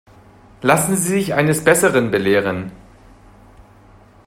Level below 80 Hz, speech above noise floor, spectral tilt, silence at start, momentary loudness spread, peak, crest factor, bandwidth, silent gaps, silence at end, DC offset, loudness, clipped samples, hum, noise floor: -50 dBFS; 31 dB; -4.5 dB/octave; 0.6 s; 9 LU; 0 dBFS; 18 dB; 16 kHz; none; 1.5 s; under 0.1%; -16 LUFS; under 0.1%; none; -47 dBFS